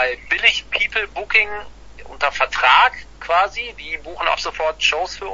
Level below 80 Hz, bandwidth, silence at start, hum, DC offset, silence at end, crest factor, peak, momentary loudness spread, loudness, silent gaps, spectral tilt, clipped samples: -44 dBFS; 8 kHz; 0 s; none; under 0.1%; 0 s; 20 dB; 0 dBFS; 14 LU; -17 LUFS; none; -1 dB/octave; under 0.1%